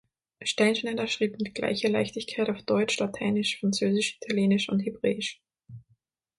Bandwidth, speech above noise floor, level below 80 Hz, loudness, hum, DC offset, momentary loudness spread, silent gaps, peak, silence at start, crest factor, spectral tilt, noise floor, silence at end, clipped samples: 11.5 kHz; 42 dB; -66 dBFS; -27 LUFS; none; under 0.1%; 6 LU; none; -10 dBFS; 0.4 s; 18 dB; -4.5 dB/octave; -69 dBFS; 0.6 s; under 0.1%